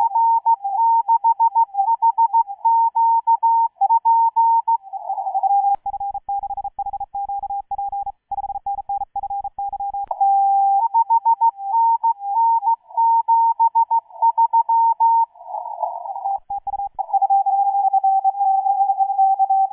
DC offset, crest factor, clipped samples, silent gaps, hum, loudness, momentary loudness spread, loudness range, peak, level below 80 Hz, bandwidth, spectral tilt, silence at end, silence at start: under 0.1%; 10 dB; under 0.1%; none; none; -19 LUFS; 11 LU; 8 LU; -8 dBFS; -58 dBFS; 1.1 kHz; -7 dB/octave; 0.05 s; 0 s